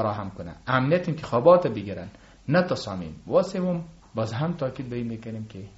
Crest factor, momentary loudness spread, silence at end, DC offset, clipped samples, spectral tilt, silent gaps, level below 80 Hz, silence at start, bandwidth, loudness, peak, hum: 20 dB; 17 LU; 0.1 s; under 0.1%; under 0.1%; -6 dB/octave; none; -54 dBFS; 0 s; 8 kHz; -25 LUFS; -4 dBFS; none